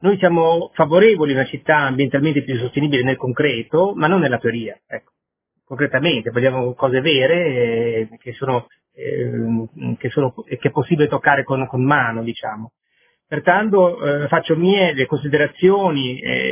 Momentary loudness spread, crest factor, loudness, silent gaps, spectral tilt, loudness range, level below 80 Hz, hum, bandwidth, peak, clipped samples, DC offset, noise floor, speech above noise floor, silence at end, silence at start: 11 LU; 18 dB; -18 LUFS; none; -10 dB/octave; 4 LU; -56 dBFS; none; 3.6 kHz; 0 dBFS; under 0.1%; under 0.1%; -76 dBFS; 59 dB; 0 s; 0 s